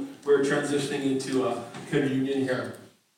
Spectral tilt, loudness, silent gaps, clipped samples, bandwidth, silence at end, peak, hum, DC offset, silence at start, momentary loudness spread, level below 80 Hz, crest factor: -5.5 dB/octave; -27 LUFS; none; under 0.1%; 16 kHz; 0.3 s; -12 dBFS; none; under 0.1%; 0 s; 8 LU; -72 dBFS; 16 dB